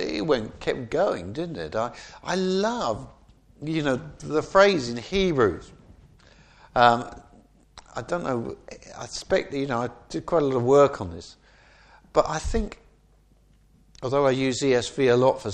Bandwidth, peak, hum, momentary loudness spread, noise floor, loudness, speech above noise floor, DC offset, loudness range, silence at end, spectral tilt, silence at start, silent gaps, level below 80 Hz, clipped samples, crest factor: 9.8 kHz; -2 dBFS; none; 17 LU; -59 dBFS; -24 LUFS; 35 dB; under 0.1%; 5 LU; 0 s; -5 dB/octave; 0 s; none; -44 dBFS; under 0.1%; 24 dB